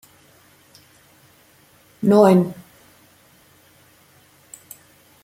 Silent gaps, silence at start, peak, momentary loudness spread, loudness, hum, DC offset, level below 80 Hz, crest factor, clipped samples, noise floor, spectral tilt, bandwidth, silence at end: none; 2 s; -2 dBFS; 30 LU; -16 LUFS; none; under 0.1%; -66 dBFS; 22 dB; under 0.1%; -54 dBFS; -7.5 dB/octave; 16 kHz; 2.7 s